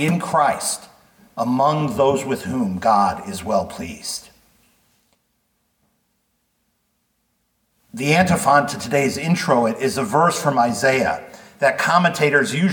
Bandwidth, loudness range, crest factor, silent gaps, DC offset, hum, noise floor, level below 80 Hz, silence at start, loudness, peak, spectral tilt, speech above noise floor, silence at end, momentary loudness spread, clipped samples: 19 kHz; 12 LU; 18 dB; none; under 0.1%; none; -69 dBFS; -54 dBFS; 0 s; -19 LUFS; -2 dBFS; -5 dB/octave; 50 dB; 0 s; 12 LU; under 0.1%